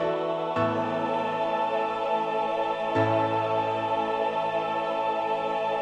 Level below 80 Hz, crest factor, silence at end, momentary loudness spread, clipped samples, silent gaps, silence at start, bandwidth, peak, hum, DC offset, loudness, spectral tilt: -66 dBFS; 14 dB; 0 s; 3 LU; under 0.1%; none; 0 s; 9 kHz; -14 dBFS; none; under 0.1%; -27 LUFS; -6.5 dB/octave